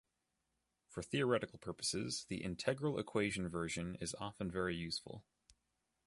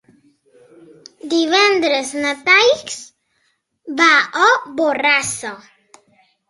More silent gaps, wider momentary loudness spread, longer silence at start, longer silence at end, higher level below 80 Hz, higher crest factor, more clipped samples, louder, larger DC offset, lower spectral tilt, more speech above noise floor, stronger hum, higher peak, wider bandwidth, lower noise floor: neither; second, 9 LU vs 17 LU; second, 0.9 s vs 1.25 s; about the same, 0.85 s vs 0.9 s; about the same, -64 dBFS vs -64 dBFS; about the same, 22 dB vs 18 dB; neither; second, -40 LUFS vs -14 LUFS; neither; first, -4.5 dB/octave vs -1.5 dB/octave; second, 46 dB vs 50 dB; neither; second, -20 dBFS vs 0 dBFS; about the same, 11.5 kHz vs 11.5 kHz; first, -86 dBFS vs -66 dBFS